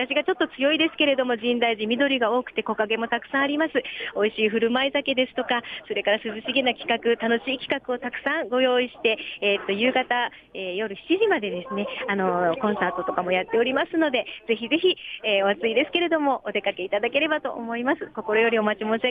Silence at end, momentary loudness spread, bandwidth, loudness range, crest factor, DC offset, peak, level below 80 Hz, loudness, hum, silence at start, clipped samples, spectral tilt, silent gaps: 0 s; 6 LU; 5 kHz; 2 LU; 16 dB; under 0.1%; -8 dBFS; -64 dBFS; -24 LUFS; none; 0 s; under 0.1%; -6.5 dB/octave; none